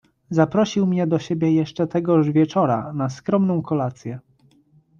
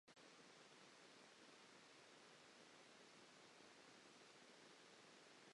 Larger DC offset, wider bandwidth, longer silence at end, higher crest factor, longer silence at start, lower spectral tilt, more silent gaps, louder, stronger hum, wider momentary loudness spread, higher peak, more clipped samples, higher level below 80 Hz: neither; second, 7.4 kHz vs 11 kHz; first, 0.8 s vs 0 s; about the same, 16 dB vs 14 dB; first, 0.3 s vs 0.05 s; first, -8 dB/octave vs -2 dB/octave; neither; first, -21 LUFS vs -66 LUFS; neither; first, 8 LU vs 0 LU; first, -4 dBFS vs -52 dBFS; neither; first, -60 dBFS vs under -90 dBFS